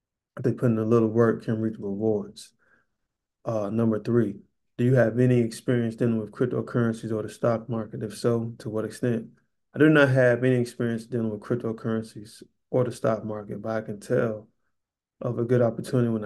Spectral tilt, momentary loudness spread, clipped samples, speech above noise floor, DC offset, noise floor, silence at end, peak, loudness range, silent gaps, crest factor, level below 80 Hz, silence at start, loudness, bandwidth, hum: -8 dB/octave; 12 LU; under 0.1%; 57 dB; under 0.1%; -82 dBFS; 0 s; -6 dBFS; 5 LU; none; 20 dB; -64 dBFS; 0.35 s; -25 LUFS; 12.5 kHz; none